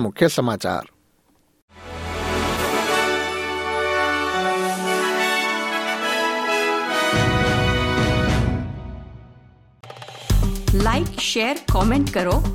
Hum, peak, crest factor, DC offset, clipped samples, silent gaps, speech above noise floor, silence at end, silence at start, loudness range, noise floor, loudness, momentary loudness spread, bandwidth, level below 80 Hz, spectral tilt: none; -2 dBFS; 20 dB; under 0.1%; under 0.1%; 1.62-1.68 s; 41 dB; 0 s; 0 s; 4 LU; -61 dBFS; -21 LUFS; 10 LU; 17 kHz; -30 dBFS; -4.5 dB/octave